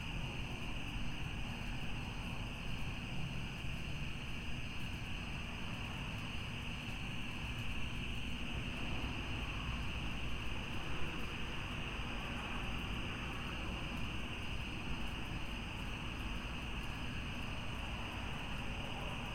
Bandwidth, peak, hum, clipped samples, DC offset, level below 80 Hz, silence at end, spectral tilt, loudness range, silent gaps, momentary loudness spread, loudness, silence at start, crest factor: 16 kHz; -26 dBFS; none; under 0.1%; under 0.1%; -48 dBFS; 0 s; -5 dB/octave; 2 LU; none; 2 LU; -43 LUFS; 0 s; 14 dB